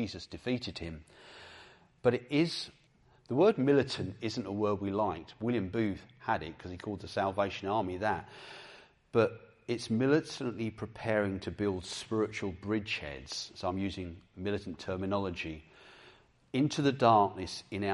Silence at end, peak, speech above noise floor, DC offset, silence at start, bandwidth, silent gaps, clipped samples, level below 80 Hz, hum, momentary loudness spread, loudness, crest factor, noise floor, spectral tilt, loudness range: 0 s; -10 dBFS; 32 dB; under 0.1%; 0 s; 11.5 kHz; none; under 0.1%; -64 dBFS; none; 15 LU; -33 LUFS; 22 dB; -65 dBFS; -6 dB/octave; 5 LU